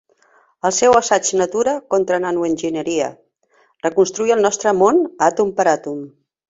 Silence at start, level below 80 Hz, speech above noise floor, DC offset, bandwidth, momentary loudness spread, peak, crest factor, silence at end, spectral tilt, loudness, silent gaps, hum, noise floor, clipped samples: 0.65 s; -58 dBFS; 42 dB; under 0.1%; 8 kHz; 8 LU; 0 dBFS; 16 dB; 0.4 s; -3.5 dB/octave; -17 LUFS; none; none; -59 dBFS; under 0.1%